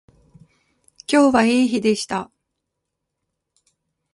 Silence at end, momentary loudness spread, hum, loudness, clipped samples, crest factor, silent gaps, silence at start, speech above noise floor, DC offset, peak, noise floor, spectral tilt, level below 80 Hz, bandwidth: 1.9 s; 17 LU; none; -18 LUFS; under 0.1%; 18 dB; none; 1.1 s; 62 dB; under 0.1%; -4 dBFS; -79 dBFS; -4.5 dB/octave; -58 dBFS; 11.5 kHz